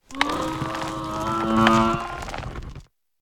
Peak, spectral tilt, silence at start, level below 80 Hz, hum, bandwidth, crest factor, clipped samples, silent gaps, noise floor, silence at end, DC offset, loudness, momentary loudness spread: 0 dBFS; -5 dB/octave; 0.1 s; -42 dBFS; none; 17.5 kHz; 24 dB; under 0.1%; none; -44 dBFS; 0.4 s; under 0.1%; -23 LUFS; 17 LU